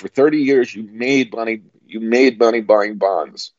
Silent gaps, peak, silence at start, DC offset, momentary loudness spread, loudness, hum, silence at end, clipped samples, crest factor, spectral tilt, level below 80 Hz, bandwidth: none; -2 dBFS; 0.05 s; under 0.1%; 11 LU; -16 LUFS; none; 0.1 s; under 0.1%; 16 dB; -5 dB/octave; -70 dBFS; 7.6 kHz